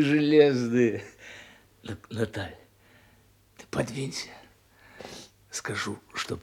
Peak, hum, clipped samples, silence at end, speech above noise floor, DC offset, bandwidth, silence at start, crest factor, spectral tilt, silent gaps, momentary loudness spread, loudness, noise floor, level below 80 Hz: -6 dBFS; none; under 0.1%; 0 s; 34 dB; under 0.1%; 16 kHz; 0 s; 22 dB; -5.5 dB/octave; none; 25 LU; -27 LUFS; -60 dBFS; -64 dBFS